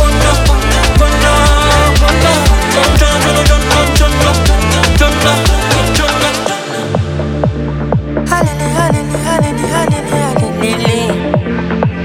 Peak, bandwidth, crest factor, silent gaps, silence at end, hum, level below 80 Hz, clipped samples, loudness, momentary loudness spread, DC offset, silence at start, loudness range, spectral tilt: 0 dBFS; 16.5 kHz; 10 dB; none; 0 s; none; -16 dBFS; under 0.1%; -11 LUFS; 6 LU; under 0.1%; 0 s; 5 LU; -4.5 dB/octave